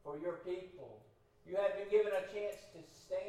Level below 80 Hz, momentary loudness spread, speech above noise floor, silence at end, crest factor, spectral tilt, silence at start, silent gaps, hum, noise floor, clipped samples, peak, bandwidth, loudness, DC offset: -74 dBFS; 22 LU; 27 dB; 0 s; 20 dB; -5 dB/octave; 0.05 s; none; none; -65 dBFS; under 0.1%; -20 dBFS; 13.5 kHz; -39 LUFS; under 0.1%